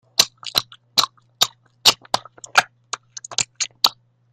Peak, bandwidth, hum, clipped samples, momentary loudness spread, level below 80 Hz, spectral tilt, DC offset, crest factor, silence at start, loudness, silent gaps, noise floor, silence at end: 0 dBFS; 16 kHz; none; under 0.1%; 12 LU; -64 dBFS; 1 dB/octave; under 0.1%; 22 dB; 0.2 s; -20 LUFS; none; -36 dBFS; 0.4 s